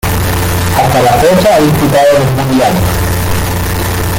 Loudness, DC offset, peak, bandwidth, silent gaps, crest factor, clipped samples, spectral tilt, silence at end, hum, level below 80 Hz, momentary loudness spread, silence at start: -10 LUFS; under 0.1%; 0 dBFS; 17 kHz; none; 10 dB; under 0.1%; -5.5 dB/octave; 0 s; none; -24 dBFS; 6 LU; 0.05 s